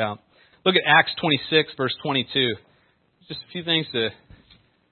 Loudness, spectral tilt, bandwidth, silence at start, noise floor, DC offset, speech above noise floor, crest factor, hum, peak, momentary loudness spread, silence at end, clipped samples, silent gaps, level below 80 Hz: -21 LUFS; -9 dB/octave; 4.5 kHz; 0 s; -63 dBFS; under 0.1%; 40 dB; 22 dB; none; -2 dBFS; 18 LU; 0.8 s; under 0.1%; none; -64 dBFS